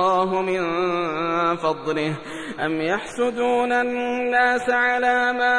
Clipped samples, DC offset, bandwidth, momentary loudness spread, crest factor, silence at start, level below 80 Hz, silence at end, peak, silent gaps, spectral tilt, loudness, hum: under 0.1%; 0.3%; 10.5 kHz; 6 LU; 14 dB; 0 s; -56 dBFS; 0 s; -8 dBFS; none; -5 dB/octave; -21 LUFS; none